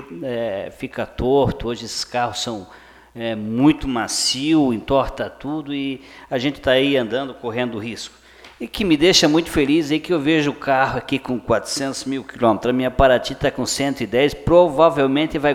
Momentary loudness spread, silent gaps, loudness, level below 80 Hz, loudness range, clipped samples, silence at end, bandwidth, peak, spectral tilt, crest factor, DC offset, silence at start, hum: 13 LU; none; -19 LUFS; -40 dBFS; 5 LU; under 0.1%; 0 s; 16 kHz; 0 dBFS; -4.5 dB/octave; 18 dB; under 0.1%; 0 s; none